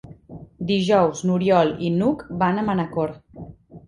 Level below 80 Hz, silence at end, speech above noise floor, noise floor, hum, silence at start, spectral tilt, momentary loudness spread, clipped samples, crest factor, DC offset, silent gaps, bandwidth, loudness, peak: -52 dBFS; 0.1 s; 21 dB; -42 dBFS; none; 0.05 s; -6.5 dB/octave; 23 LU; under 0.1%; 18 dB; under 0.1%; none; 11 kHz; -21 LUFS; -4 dBFS